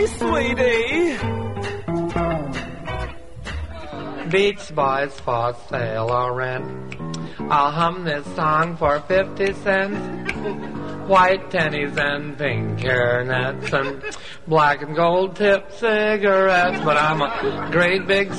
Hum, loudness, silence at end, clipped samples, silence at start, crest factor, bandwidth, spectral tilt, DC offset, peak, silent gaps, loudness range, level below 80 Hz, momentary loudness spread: none; -20 LUFS; 0 s; under 0.1%; 0 s; 18 dB; 11.5 kHz; -5.5 dB/octave; 1%; -4 dBFS; none; 6 LU; -42 dBFS; 13 LU